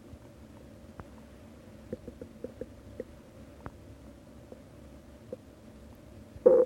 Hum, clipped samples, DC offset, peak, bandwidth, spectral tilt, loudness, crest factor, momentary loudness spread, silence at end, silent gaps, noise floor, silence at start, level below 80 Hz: none; under 0.1%; under 0.1%; -8 dBFS; 11.5 kHz; -8 dB/octave; -36 LUFS; 28 dB; 8 LU; 0 s; none; -52 dBFS; 1 s; -56 dBFS